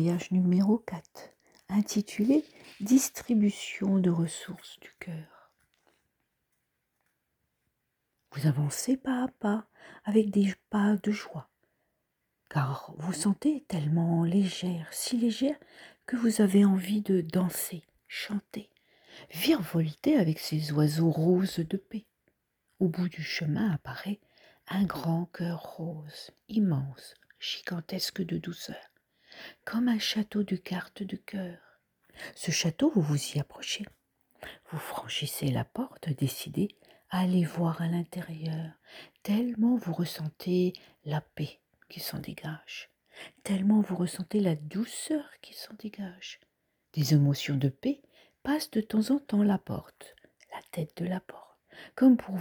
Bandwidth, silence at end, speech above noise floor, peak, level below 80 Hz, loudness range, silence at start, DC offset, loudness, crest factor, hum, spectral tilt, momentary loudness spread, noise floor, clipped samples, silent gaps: over 20 kHz; 0 s; 51 dB; -10 dBFS; -68 dBFS; 6 LU; 0 s; under 0.1%; -30 LUFS; 20 dB; none; -6 dB/octave; 17 LU; -81 dBFS; under 0.1%; none